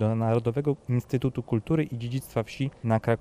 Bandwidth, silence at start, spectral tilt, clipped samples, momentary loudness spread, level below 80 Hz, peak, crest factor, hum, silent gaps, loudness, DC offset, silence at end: 15 kHz; 0 s; -8 dB/octave; under 0.1%; 6 LU; -54 dBFS; -10 dBFS; 16 dB; none; none; -28 LUFS; under 0.1%; 0 s